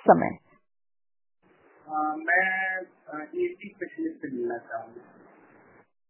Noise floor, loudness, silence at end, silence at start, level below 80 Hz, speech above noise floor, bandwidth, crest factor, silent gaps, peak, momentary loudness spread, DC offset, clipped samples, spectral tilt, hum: -58 dBFS; -28 LUFS; 1.1 s; 0.05 s; -68 dBFS; 30 dB; 3.2 kHz; 26 dB; none; -4 dBFS; 17 LU; under 0.1%; under 0.1%; -5 dB/octave; none